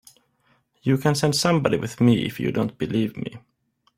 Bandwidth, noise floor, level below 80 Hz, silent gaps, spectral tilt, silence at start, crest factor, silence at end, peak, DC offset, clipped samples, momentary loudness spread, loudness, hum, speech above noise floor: 16.5 kHz; -65 dBFS; -56 dBFS; none; -5.5 dB/octave; 0.85 s; 20 dB; 0.6 s; -4 dBFS; under 0.1%; under 0.1%; 9 LU; -22 LUFS; none; 43 dB